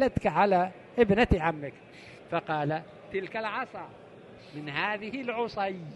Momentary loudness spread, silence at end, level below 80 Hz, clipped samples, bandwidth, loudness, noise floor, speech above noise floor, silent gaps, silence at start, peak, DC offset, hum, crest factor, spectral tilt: 21 LU; 0 s; -46 dBFS; under 0.1%; 11.5 kHz; -29 LUFS; -50 dBFS; 21 dB; none; 0 s; -10 dBFS; under 0.1%; none; 20 dB; -7 dB/octave